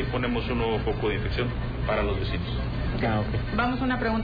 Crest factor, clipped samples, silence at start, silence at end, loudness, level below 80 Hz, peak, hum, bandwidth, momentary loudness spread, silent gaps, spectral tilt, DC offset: 10 dB; under 0.1%; 0 s; 0 s; -27 LUFS; -34 dBFS; -16 dBFS; none; 5 kHz; 4 LU; none; -9 dB/octave; under 0.1%